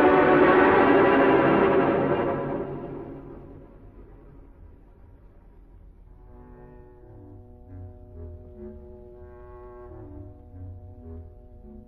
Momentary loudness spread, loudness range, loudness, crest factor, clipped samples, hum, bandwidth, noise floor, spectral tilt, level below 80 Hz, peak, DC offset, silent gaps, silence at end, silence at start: 27 LU; 26 LU; -20 LUFS; 18 dB; under 0.1%; none; 4.9 kHz; -50 dBFS; -9.5 dB/octave; -48 dBFS; -8 dBFS; under 0.1%; none; 0.1 s; 0 s